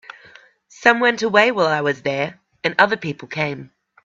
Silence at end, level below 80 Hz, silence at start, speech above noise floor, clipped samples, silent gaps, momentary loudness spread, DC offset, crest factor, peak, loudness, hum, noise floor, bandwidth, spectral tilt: 0.4 s; -64 dBFS; 0.8 s; 30 dB; under 0.1%; none; 11 LU; under 0.1%; 20 dB; 0 dBFS; -18 LUFS; none; -48 dBFS; 7.8 kHz; -4.5 dB/octave